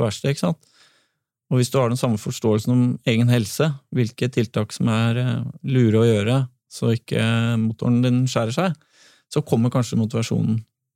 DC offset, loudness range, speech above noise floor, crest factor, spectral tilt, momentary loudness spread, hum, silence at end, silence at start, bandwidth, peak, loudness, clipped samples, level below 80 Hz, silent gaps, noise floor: under 0.1%; 2 LU; 51 dB; 16 dB; -6.5 dB/octave; 7 LU; none; 0.3 s; 0 s; 14.5 kHz; -4 dBFS; -21 LUFS; under 0.1%; -60 dBFS; none; -71 dBFS